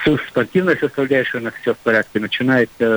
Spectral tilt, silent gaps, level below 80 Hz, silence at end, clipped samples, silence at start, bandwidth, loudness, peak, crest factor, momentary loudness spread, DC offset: -6.5 dB/octave; none; -48 dBFS; 0 s; under 0.1%; 0 s; over 20 kHz; -18 LUFS; -4 dBFS; 14 dB; 6 LU; under 0.1%